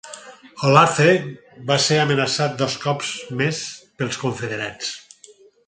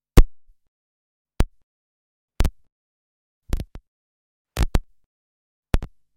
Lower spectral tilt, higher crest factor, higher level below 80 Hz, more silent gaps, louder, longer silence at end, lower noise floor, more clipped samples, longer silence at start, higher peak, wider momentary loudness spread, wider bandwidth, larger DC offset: second, -4 dB/octave vs -6 dB/octave; about the same, 22 dB vs 24 dB; second, -60 dBFS vs -26 dBFS; second, none vs 0.68-1.25 s, 1.63-2.28 s, 2.72-3.41 s, 3.88-4.45 s, 5.06-5.63 s; first, -20 LUFS vs -27 LUFS; first, 0.65 s vs 0.3 s; second, -50 dBFS vs under -90 dBFS; neither; about the same, 0.05 s vs 0.15 s; about the same, 0 dBFS vs 0 dBFS; first, 18 LU vs 11 LU; second, 9.6 kHz vs 16 kHz; neither